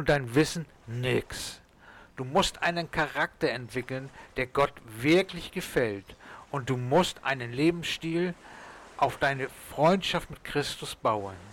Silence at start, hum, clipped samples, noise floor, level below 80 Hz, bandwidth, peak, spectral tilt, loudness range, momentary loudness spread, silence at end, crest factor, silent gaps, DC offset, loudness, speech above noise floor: 0 s; none; under 0.1%; -53 dBFS; -52 dBFS; 18 kHz; -14 dBFS; -5 dB/octave; 2 LU; 14 LU; 0 s; 16 dB; none; under 0.1%; -29 LUFS; 25 dB